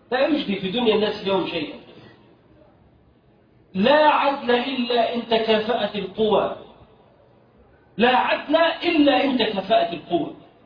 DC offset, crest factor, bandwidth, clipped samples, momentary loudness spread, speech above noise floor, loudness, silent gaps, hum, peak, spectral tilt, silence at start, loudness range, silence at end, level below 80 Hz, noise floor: under 0.1%; 18 dB; 5.2 kHz; under 0.1%; 10 LU; 36 dB; -20 LUFS; none; none; -4 dBFS; -7.5 dB/octave; 0.1 s; 5 LU; 0.3 s; -58 dBFS; -56 dBFS